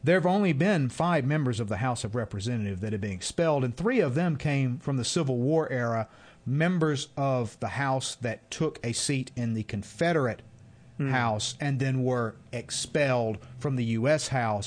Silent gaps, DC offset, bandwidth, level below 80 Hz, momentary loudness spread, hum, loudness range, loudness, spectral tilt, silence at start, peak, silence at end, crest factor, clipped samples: none; under 0.1%; 10 kHz; -58 dBFS; 8 LU; none; 2 LU; -28 LUFS; -5.5 dB/octave; 0 s; -10 dBFS; 0 s; 16 dB; under 0.1%